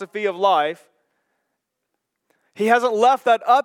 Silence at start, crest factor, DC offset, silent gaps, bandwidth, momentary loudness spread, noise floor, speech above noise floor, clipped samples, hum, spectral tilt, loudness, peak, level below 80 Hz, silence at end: 0 s; 18 dB; under 0.1%; none; 15 kHz; 10 LU; -78 dBFS; 60 dB; under 0.1%; none; -4 dB/octave; -18 LUFS; -2 dBFS; under -90 dBFS; 0.05 s